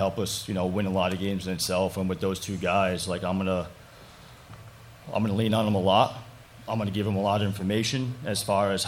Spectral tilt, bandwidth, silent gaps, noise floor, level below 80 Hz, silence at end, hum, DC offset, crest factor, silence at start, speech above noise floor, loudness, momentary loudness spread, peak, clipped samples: -5 dB/octave; 16.5 kHz; none; -49 dBFS; -56 dBFS; 0 s; none; under 0.1%; 18 dB; 0 s; 22 dB; -27 LUFS; 17 LU; -8 dBFS; under 0.1%